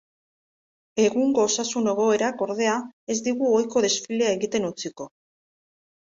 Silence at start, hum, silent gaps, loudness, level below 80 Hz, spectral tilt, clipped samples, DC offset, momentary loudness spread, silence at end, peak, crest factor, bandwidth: 0.95 s; none; 2.93-3.07 s; -23 LUFS; -68 dBFS; -3 dB/octave; under 0.1%; under 0.1%; 11 LU; 0.95 s; -8 dBFS; 16 dB; 7.8 kHz